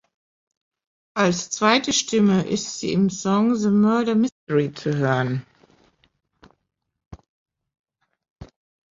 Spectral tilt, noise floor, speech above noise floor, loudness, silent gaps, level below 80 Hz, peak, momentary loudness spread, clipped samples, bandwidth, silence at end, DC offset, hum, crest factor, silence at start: -5 dB/octave; -79 dBFS; 58 dB; -21 LUFS; 4.32-4.47 s, 7.06-7.11 s, 7.29-7.46 s, 7.79-7.84 s, 8.30-8.36 s; -58 dBFS; -2 dBFS; 7 LU; under 0.1%; 7.8 kHz; 0.45 s; under 0.1%; none; 20 dB; 1.15 s